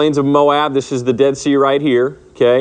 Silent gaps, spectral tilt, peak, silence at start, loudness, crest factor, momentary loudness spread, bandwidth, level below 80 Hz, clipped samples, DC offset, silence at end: none; -5.5 dB/octave; 0 dBFS; 0 s; -14 LUFS; 14 dB; 5 LU; 9.4 kHz; -52 dBFS; under 0.1%; under 0.1%; 0 s